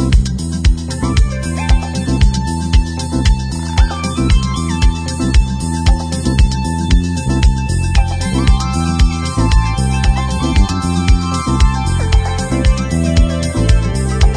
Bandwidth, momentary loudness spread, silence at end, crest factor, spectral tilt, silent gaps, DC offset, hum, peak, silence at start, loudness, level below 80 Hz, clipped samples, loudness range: 10.5 kHz; 3 LU; 0 s; 12 dB; -5.5 dB/octave; none; under 0.1%; none; 0 dBFS; 0 s; -15 LUFS; -14 dBFS; under 0.1%; 1 LU